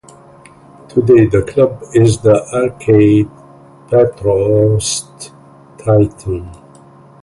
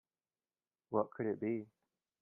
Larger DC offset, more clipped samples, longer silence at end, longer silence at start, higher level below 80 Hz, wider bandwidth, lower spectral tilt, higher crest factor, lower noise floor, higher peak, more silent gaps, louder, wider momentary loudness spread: neither; neither; first, 0.7 s vs 0.55 s; about the same, 0.95 s vs 0.9 s; first, -38 dBFS vs -84 dBFS; first, 11.5 kHz vs 3 kHz; second, -6.5 dB/octave vs -10 dB/octave; second, 14 dB vs 22 dB; second, -41 dBFS vs under -90 dBFS; first, 0 dBFS vs -20 dBFS; neither; first, -13 LUFS vs -39 LUFS; first, 14 LU vs 6 LU